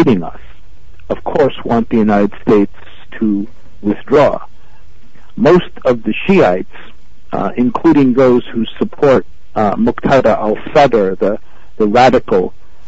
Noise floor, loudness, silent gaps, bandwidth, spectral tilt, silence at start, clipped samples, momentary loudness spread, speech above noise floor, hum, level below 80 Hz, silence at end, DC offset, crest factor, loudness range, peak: -44 dBFS; -13 LUFS; none; 8 kHz; -7.5 dB/octave; 0 s; under 0.1%; 13 LU; 32 dB; none; -38 dBFS; 0.4 s; 7%; 14 dB; 3 LU; 0 dBFS